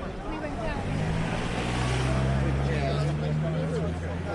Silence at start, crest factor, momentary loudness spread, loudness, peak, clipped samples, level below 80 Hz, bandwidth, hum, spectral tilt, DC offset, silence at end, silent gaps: 0 s; 14 dB; 6 LU; -28 LUFS; -14 dBFS; under 0.1%; -36 dBFS; 11.5 kHz; none; -6.5 dB/octave; under 0.1%; 0 s; none